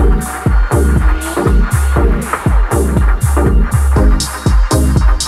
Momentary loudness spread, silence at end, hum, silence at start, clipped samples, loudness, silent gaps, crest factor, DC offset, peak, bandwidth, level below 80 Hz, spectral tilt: 3 LU; 0 s; none; 0 s; under 0.1%; -13 LUFS; none; 10 dB; under 0.1%; 0 dBFS; 14.5 kHz; -12 dBFS; -6 dB/octave